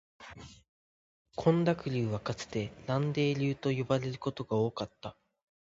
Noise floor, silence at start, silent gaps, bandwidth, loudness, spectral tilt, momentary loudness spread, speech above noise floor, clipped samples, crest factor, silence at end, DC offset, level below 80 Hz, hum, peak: under -90 dBFS; 0.2 s; 0.69-1.25 s; 7.8 kHz; -32 LUFS; -7 dB/octave; 18 LU; over 58 dB; under 0.1%; 22 dB; 0.5 s; under 0.1%; -62 dBFS; none; -12 dBFS